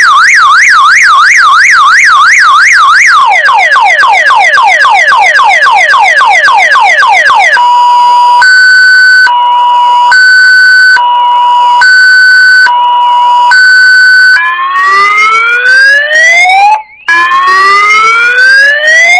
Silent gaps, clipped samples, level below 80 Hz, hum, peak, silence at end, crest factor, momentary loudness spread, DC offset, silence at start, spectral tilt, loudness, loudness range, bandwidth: none; 10%; -48 dBFS; none; 0 dBFS; 0 s; 2 dB; 4 LU; under 0.1%; 0 s; 2 dB/octave; -2 LUFS; 2 LU; 11 kHz